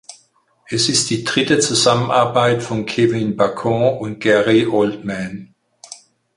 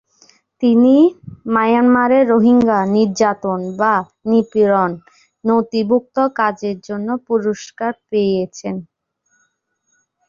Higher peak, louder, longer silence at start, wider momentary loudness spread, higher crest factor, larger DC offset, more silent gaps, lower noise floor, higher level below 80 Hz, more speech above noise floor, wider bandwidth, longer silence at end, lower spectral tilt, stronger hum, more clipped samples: about the same, -2 dBFS vs -2 dBFS; about the same, -16 LUFS vs -16 LUFS; second, 0.1 s vs 0.6 s; about the same, 12 LU vs 12 LU; about the same, 16 dB vs 14 dB; neither; neither; second, -57 dBFS vs -67 dBFS; about the same, -54 dBFS vs -58 dBFS; second, 41 dB vs 52 dB; first, 11.5 kHz vs 7.4 kHz; second, 0.4 s vs 1.45 s; second, -4 dB/octave vs -6.5 dB/octave; neither; neither